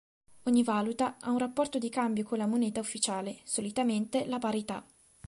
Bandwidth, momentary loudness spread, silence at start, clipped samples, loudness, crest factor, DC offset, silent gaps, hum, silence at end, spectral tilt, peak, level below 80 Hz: 11.5 kHz; 6 LU; 0.45 s; under 0.1%; -31 LUFS; 16 dB; under 0.1%; none; none; 0.45 s; -4 dB/octave; -14 dBFS; -70 dBFS